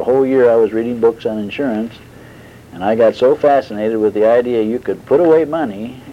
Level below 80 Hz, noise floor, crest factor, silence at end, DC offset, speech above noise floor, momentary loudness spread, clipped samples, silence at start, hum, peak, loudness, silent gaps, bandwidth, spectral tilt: -52 dBFS; -38 dBFS; 12 dB; 0 s; under 0.1%; 24 dB; 10 LU; under 0.1%; 0 s; none; -2 dBFS; -14 LUFS; none; 10.5 kHz; -7.5 dB/octave